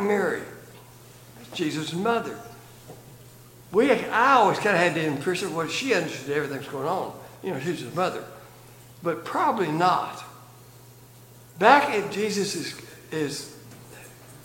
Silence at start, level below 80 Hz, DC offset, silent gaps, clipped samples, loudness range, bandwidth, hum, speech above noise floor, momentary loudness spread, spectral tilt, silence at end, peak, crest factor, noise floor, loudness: 0 s; -66 dBFS; under 0.1%; none; under 0.1%; 7 LU; 17 kHz; none; 25 dB; 26 LU; -4.5 dB/octave; 0 s; -2 dBFS; 24 dB; -49 dBFS; -24 LUFS